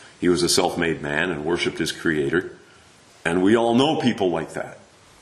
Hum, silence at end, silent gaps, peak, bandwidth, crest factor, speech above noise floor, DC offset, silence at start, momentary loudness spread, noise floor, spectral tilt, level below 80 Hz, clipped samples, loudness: none; 0.45 s; none; -4 dBFS; 13 kHz; 18 dB; 30 dB; under 0.1%; 0 s; 10 LU; -51 dBFS; -4 dB/octave; -52 dBFS; under 0.1%; -21 LUFS